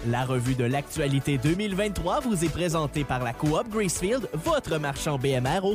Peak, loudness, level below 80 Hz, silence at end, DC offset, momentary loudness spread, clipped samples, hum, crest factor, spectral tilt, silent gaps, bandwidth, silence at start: -12 dBFS; -26 LUFS; -42 dBFS; 0 s; under 0.1%; 3 LU; under 0.1%; none; 14 dB; -5.5 dB/octave; none; 15.5 kHz; 0 s